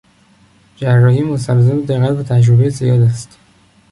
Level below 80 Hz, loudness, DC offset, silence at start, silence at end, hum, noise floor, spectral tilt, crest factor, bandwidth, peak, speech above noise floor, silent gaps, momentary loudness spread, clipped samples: -46 dBFS; -13 LUFS; under 0.1%; 0.8 s; 0.65 s; none; -50 dBFS; -8 dB/octave; 12 dB; 11.5 kHz; -2 dBFS; 38 dB; none; 5 LU; under 0.1%